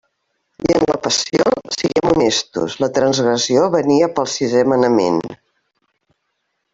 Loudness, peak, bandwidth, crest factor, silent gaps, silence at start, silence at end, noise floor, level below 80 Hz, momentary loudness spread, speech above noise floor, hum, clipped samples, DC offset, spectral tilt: -16 LUFS; -2 dBFS; 8 kHz; 16 dB; none; 0.6 s; 1.4 s; -71 dBFS; -50 dBFS; 5 LU; 56 dB; none; under 0.1%; under 0.1%; -4 dB/octave